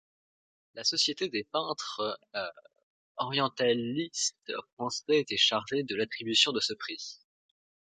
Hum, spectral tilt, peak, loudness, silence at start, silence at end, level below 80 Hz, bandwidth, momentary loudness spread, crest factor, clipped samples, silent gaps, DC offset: none; -2.5 dB/octave; -10 dBFS; -30 LUFS; 0.75 s; 0.75 s; -76 dBFS; 9.6 kHz; 14 LU; 24 dB; under 0.1%; 2.83-3.15 s, 4.73-4.77 s; under 0.1%